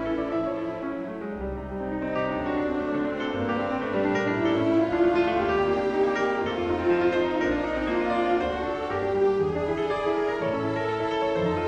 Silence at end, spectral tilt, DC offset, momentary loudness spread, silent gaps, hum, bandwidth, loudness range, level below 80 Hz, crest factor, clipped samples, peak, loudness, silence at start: 0 s; -7 dB/octave; under 0.1%; 8 LU; none; none; 8.2 kHz; 5 LU; -46 dBFS; 14 dB; under 0.1%; -12 dBFS; -26 LUFS; 0 s